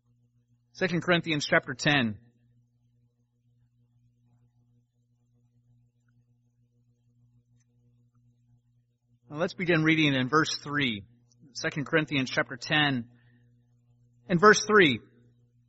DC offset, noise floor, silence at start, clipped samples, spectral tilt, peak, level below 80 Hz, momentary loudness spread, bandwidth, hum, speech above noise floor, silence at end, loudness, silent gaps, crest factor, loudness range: under 0.1%; -70 dBFS; 0.75 s; under 0.1%; -3 dB/octave; -4 dBFS; -66 dBFS; 14 LU; 8 kHz; 60 Hz at -65 dBFS; 45 dB; 0.7 s; -25 LUFS; none; 26 dB; 8 LU